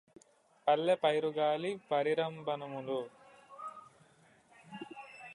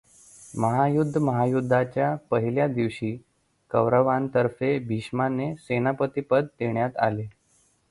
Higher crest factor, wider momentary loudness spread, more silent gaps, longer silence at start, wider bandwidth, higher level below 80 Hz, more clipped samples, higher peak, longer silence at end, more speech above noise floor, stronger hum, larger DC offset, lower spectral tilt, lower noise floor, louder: about the same, 20 dB vs 18 dB; first, 19 LU vs 7 LU; neither; first, 0.65 s vs 0.4 s; about the same, 11 kHz vs 11.5 kHz; second, -84 dBFS vs -60 dBFS; neither; second, -16 dBFS vs -6 dBFS; second, 0 s vs 0.6 s; second, 33 dB vs 40 dB; neither; neither; second, -5.5 dB/octave vs -8 dB/octave; about the same, -65 dBFS vs -65 dBFS; second, -33 LUFS vs -25 LUFS